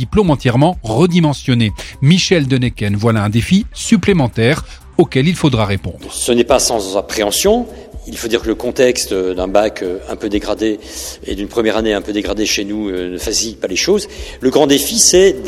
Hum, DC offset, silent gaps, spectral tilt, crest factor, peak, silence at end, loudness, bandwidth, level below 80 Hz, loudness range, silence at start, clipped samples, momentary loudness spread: none; under 0.1%; none; -4.5 dB/octave; 14 dB; 0 dBFS; 0 s; -14 LUFS; 16 kHz; -34 dBFS; 4 LU; 0 s; under 0.1%; 9 LU